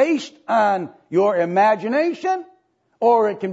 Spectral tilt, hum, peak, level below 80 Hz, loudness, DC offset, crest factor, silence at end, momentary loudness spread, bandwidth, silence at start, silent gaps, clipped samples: -6 dB/octave; none; -6 dBFS; -78 dBFS; -19 LUFS; under 0.1%; 14 dB; 0 s; 8 LU; 8 kHz; 0 s; none; under 0.1%